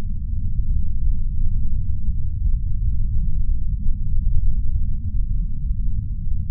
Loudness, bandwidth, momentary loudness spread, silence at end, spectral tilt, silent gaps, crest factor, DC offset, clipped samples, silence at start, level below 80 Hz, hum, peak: -26 LUFS; 0.3 kHz; 3 LU; 0 s; -18 dB/octave; none; 12 dB; under 0.1%; under 0.1%; 0 s; -20 dBFS; none; -4 dBFS